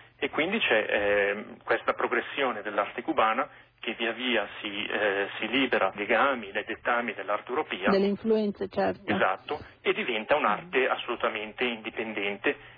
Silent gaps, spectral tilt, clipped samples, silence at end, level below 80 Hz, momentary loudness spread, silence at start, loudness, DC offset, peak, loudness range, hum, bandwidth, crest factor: none; -7.5 dB/octave; under 0.1%; 0 s; -64 dBFS; 7 LU; 0.2 s; -28 LUFS; under 0.1%; -12 dBFS; 2 LU; none; 5 kHz; 16 dB